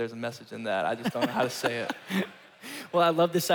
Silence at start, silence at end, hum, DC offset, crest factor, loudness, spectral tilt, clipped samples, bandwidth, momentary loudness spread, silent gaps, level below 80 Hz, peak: 0 s; 0 s; none; under 0.1%; 16 dB; -29 LUFS; -4.5 dB/octave; under 0.1%; 19.5 kHz; 14 LU; none; -74 dBFS; -12 dBFS